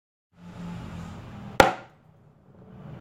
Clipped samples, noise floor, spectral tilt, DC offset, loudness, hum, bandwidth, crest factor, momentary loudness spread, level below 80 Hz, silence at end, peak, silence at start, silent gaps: under 0.1%; -56 dBFS; -4.5 dB/octave; under 0.1%; -24 LUFS; none; 16 kHz; 30 dB; 24 LU; -50 dBFS; 0 s; 0 dBFS; 0.4 s; none